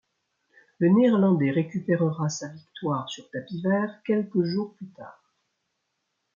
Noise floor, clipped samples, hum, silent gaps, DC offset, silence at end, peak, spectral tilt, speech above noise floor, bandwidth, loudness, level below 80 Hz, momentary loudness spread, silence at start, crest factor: -78 dBFS; under 0.1%; none; none; under 0.1%; 1.25 s; -10 dBFS; -7 dB/octave; 54 dB; 7.4 kHz; -25 LUFS; -72 dBFS; 16 LU; 0.8 s; 16 dB